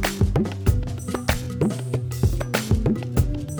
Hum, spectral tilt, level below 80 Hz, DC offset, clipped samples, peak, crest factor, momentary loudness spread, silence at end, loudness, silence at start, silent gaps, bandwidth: none; -6 dB/octave; -30 dBFS; under 0.1%; under 0.1%; -6 dBFS; 16 dB; 5 LU; 0 s; -24 LUFS; 0 s; none; over 20 kHz